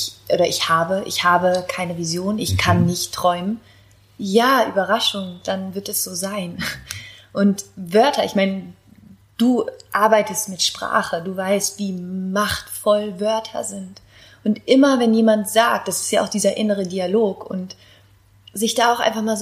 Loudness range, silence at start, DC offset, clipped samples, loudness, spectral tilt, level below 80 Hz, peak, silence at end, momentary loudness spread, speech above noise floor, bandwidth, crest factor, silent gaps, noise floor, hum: 4 LU; 0 s; under 0.1%; under 0.1%; -19 LUFS; -4 dB/octave; -52 dBFS; -2 dBFS; 0 s; 12 LU; 33 dB; 15.5 kHz; 18 dB; none; -52 dBFS; none